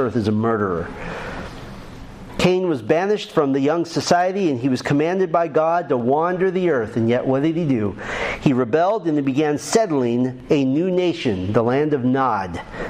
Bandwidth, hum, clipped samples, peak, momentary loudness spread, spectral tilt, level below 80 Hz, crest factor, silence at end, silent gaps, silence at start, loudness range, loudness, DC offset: 15 kHz; none; under 0.1%; 0 dBFS; 11 LU; -6 dB/octave; -46 dBFS; 18 dB; 0 s; none; 0 s; 3 LU; -20 LUFS; under 0.1%